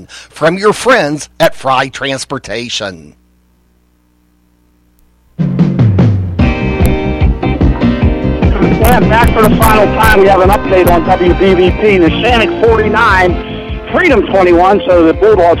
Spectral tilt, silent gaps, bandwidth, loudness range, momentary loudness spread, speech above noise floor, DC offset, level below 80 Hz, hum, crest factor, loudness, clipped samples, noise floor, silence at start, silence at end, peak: -6 dB/octave; none; 17 kHz; 11 LU; 10 LU; 43 dB; under 0.1%; -20 dBFS; 60 Hz at -35 dBFS; 10 dB; -9 LUFS; under 0.1%; -51 dBFS; 0 s; 0 s; 0 dBFS